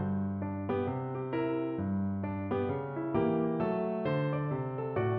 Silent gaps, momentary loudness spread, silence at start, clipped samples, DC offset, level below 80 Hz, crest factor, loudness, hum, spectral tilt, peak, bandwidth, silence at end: none; 5 LU; 0 s; under 0.1%; under 0.1%; -62 dBFS; 14 dB; -33 LUFS; none; -8 dB/octave; -18 dBFS; 5 kHz; 0 s